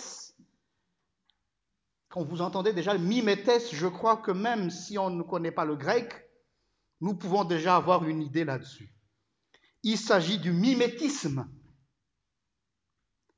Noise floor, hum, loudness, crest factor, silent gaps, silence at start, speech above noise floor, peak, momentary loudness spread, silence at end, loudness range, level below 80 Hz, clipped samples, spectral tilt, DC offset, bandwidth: -85 dBFS; none; -28 LUFS; 22 dB; none; 0 s; 57 dB; -10 dBFS; 13 LU; 1.8 s; 3 LU; -72 dBFS; under 0.1%; -5.5 dB/octave; under 0.1%; 8 kHz